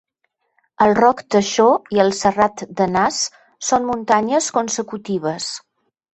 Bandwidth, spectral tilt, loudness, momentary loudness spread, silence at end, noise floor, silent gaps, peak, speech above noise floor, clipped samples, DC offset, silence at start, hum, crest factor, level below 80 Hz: 8.6 kHz; -3.5 dB/octave; -18 LUFS; 10 LU; 0.55 s; -71 dBFS; none; -2 dBFS; 53 dB; under 0.1%; under 0.1%; 0.8 s; none; 16 dB; -56 dBFS